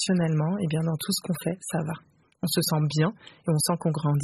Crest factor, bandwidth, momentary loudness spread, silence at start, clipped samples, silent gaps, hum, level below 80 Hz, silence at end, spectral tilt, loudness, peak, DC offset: 16 dB; 13.5 kHz; 8 LU; 0 s; under 0.1%; none; none; -62 dBFS; 0 s; -5.5 dB/octave; -27 LUFS; -10 dBFS; under 0.1%